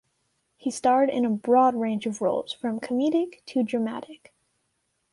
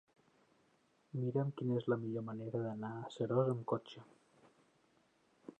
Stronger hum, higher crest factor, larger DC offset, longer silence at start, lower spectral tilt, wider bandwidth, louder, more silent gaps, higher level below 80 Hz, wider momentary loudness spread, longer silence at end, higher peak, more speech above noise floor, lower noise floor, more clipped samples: neither; about the same, 16 dB vs 18 dB; neither; second, 0.65 s vs 1.15 s; second, -5.5 dB/octave vs -9 dB/octave; first, 11.5 kHz vs 8.8 kHz; first, -25 LUFS vs -39 LUFS; neither; first, -72 dBFS vs -84 dBFS; second, 11 LU vs 18 LU; first, 0.95 s vs 0.1 s; first, -10 dBFS vs -22 dBFS; first, 50 dB vs 36 dB; about the same, -75 dBFS vs -74 dBFS; neither